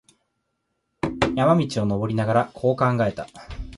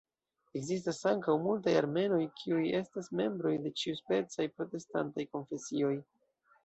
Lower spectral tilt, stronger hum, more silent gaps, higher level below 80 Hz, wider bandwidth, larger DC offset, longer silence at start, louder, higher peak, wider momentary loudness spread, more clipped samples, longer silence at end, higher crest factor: first, -7 dB/octave vs -5.5 dB/octave; neither; neither; first, -44 dBFS vs -76 dBFS; first, 11.5 kHz vs 8.2 kHz; neither; first, 1.05 s vs 0.55 s; first, -22 LUFS vs -34 LUFS; first, -4 dBFS vs -16 dBFS; first, 14 LU vs 10 LU; neither; second, 0 s vs 0.65 s; about the same, 18 dB vs 18 dB